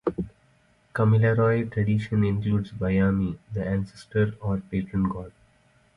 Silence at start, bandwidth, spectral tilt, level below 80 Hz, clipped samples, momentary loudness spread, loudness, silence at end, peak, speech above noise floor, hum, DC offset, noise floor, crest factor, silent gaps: 0.05 s; 5.8 kHz; -9.5 dB/octave; -46 dBFS; under 0.1%; 11 LU; -25 LUFS; 0.65 s; -10 dBFS; 38 dB; none; under 0.1%; -62 dBFS; 14 dB; none